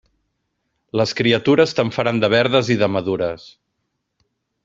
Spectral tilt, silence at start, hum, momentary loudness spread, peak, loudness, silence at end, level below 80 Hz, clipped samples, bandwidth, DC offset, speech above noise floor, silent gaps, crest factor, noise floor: -5.5 dB/octave; 0.95 s; none; 9 LU; -2 dBFS; -18 LUFS; 1.3 s; -56 dBFS; under 0.1%; 7.8 kHz; under 0.1%; 57 dB; none; 18 dB; -74 dBFS